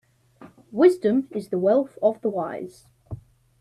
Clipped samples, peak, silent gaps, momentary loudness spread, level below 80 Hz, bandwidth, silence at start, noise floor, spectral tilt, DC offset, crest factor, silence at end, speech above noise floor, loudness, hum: under 0.1%; -4 dBFS; none; 22 LU; -60 dBFS; 11.5 kHz; 0.4 s; -50 dBFS; -7.5 dB/octave; under 0.1%; 20 dB; 0.45 s; 28 dB; -22 LUFS; none